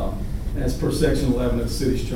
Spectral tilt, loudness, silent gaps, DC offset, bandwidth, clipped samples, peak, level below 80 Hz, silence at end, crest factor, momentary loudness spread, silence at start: -6.5 dB/octave; -23 LUFS; none; under 0.1%; 16.5 kHz; under 0.1%; -8 dBFS; -26 dBFS; 0 s; 14 dB; 8 LU; 0 s